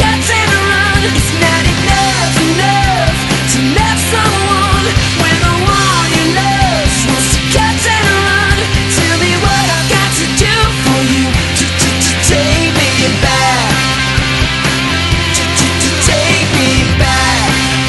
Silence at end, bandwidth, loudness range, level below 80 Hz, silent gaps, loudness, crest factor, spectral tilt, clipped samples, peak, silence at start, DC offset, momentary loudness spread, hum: 0 s; 12.5 kHz; 0 LU; -22 dBFS; none; -10 LUFS; 10 dB; -3.5 dB/octave; under 0.1%; 0 dBFS; 0 s; under 0.1%; 2 LU; none